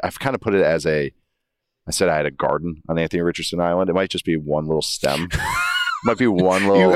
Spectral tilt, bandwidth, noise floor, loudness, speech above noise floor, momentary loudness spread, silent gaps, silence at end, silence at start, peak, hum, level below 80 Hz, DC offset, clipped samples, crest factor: -5 dB/octave; 15.5 kHz; -77 dBFS; -20 LUFS; 58 dB; 6 LU; none; 0 s; 0 s; -2 dBFS; none; -44 dBFS; under 0.1%; under 0.1%; 18 dB